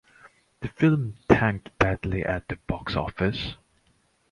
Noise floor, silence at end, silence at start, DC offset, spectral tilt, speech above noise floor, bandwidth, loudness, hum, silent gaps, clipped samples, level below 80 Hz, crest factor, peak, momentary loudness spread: -66 dBFS; 0.75 s; 0.25 s; under 0.1%; -7.5 dB/octave; 40 dB; 11 kHz; -26 LUFS; none; none; under 0.1%; -42 dBFS; 26 dB; 0 dBFS; 12 LU